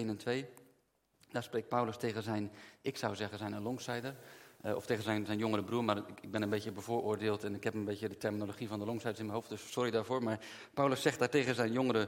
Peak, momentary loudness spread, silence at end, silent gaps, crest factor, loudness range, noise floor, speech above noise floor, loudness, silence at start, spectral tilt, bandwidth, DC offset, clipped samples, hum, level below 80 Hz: -16 dBFS; 10 LU; 0 s; none; 22 dB; 4 LU; -75 dBFS; 39 dB; -37 LUFS; 0 s; -5.5 dB/octave; 16.5 kHz; under 0.1%; under 0.1%; none; -78 dBFS